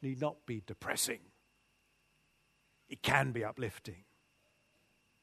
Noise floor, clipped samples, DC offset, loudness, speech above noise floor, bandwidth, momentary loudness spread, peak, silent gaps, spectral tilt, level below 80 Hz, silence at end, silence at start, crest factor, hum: -74 dBFS; under 0.1%; under 0.1%; -36 LUFS; 37 dB; 13.5 kHz; 17 LU; -10 dBFS; none; -3.5 dB/octave; -68 dBFS; 1.25 s; 0 s; 30 dB; none